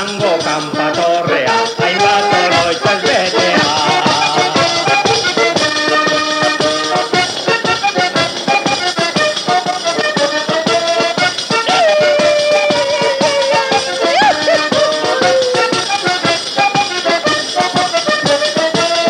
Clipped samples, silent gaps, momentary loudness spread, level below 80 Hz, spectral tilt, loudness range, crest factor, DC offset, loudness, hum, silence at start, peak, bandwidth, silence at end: under 0.1%; none; 3 LU; -54 dBFS; -3 dB/octave; 2 LU; 12 dB; under 0.1%; -12 LUFS; none; 0 s; 0 dBFS; 15.5 kHz; 0 s